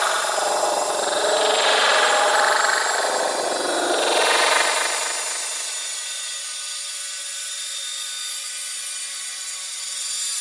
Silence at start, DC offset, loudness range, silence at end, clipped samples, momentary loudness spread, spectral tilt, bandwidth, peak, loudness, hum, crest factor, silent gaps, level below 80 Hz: 0 s; under 0.1%; 8 LU; 0 s; under 0.1%; 10 LU; 1.5 dB/octave; 12 kHz; -6 dBFS; -21 LUFS; none; 18 dB; none; -82 dBFS